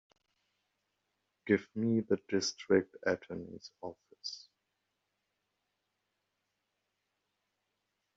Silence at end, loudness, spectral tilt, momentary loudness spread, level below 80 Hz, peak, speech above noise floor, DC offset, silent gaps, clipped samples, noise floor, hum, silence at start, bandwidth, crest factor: 3.8 s; -34 LUFS; -4.5 dB/octave; 17 LU; -78 dBFS; -14 dBFS; 51 dB; under 0.1%; none; under 0.1%; -84 dBFS; 50 Hz at -65 dBFS; 1.45 s; 7.6 kHz; 24 dB